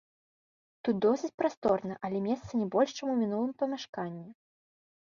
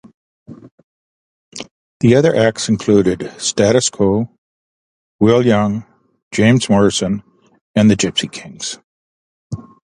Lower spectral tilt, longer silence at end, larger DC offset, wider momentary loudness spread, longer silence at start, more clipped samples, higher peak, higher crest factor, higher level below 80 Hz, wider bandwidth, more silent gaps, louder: first, -6.5 dB/octave vs -5 dB/octave; first, 0.7 s vs 0.3 s; neither; second, 9 LU vs 19 LU; first, 0.85 s vs 0.5 s; neither; second, -14 dBFS vs 0 dBFS; about the same, 18 dB vs 16 dB; second, -68 dBFS vs -46 dBFS; second, 7.4 kHz vs 11 kHz; second, 1.34-1.38 s, 1.57-1.62 s, 3.89-3.93 s vs 0.71-1.52 s, 1.71-2.00 s, 4.38-5.19 s, 6.22-6.31 s, 7.61-7.74 s, 8.84-9.50 s; second, -31 LUFS vs -15 LUFS